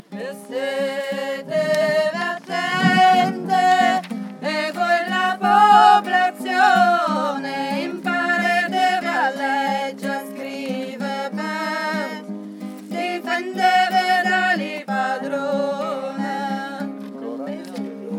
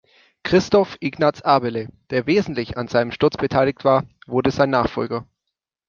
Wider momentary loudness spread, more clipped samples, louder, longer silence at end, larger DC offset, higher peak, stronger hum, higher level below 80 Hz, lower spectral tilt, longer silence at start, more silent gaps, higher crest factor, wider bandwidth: first, 15 LU vs 9 LU; neither; about the same, -20 LUFS vs -20 LUFS; second, 0 s vs 0.65 s; neither; about the same, -2 dBFS vs -2 dBFS; neither; second, under -90 dBFS vs -50 dBFS; second, -4.5 dB/octave vs -6.5 dB/octave; second, 0.1 s vs 0.45 s; neither; about the same, 18 dB vs 18 dB; first, 16 kHz vs 7.2 kHz